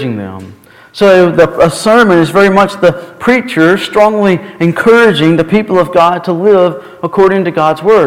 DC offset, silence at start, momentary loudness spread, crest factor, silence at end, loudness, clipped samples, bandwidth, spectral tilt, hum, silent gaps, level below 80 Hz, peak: under 0.1%; 0 s; 9 LU; 8 dB; 0 s; -9 LUFS; 2%; 16 kHz; -6 dB/octave; none; none; -42 dBFS; 0 dBFS